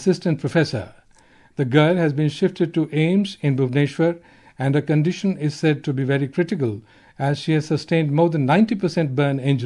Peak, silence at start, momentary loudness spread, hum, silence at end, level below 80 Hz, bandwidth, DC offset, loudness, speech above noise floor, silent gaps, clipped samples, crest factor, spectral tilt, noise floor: -2 dBFS; 0 s; 8 LU; none; 0 s; -62 dBFS; 11 kHz; under 0.1%; -20 LUFS; 33 dB; none; under 0.1%; 18 dB; -7.5 dB/octave; -53 dBFS